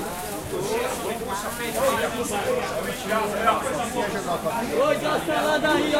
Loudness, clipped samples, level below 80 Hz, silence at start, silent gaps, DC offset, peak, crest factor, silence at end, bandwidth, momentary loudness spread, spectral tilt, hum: -25 LUFS; under 0.1%; -48 dBFS; 0 s; none; under 0.1%; -8 dBFS; 16 dB; 0 s; 16 kHz; 7 LU; -3.5 dB/octave; none